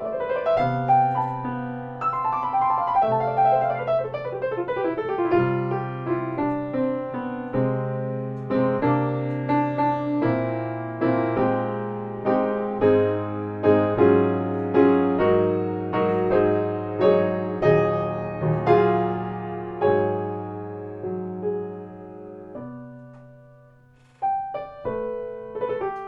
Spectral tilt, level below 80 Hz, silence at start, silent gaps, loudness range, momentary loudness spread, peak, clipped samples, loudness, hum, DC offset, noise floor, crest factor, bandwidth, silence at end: -10 dB/octave; -54 dBFS; 0 s; none; 12 LU; 12 LU; -4 dBFS; under 0.1%; -23 LUFS; none; under 0.1%; -54 dBFS; 18 dB; 5.8 kHz; 0 s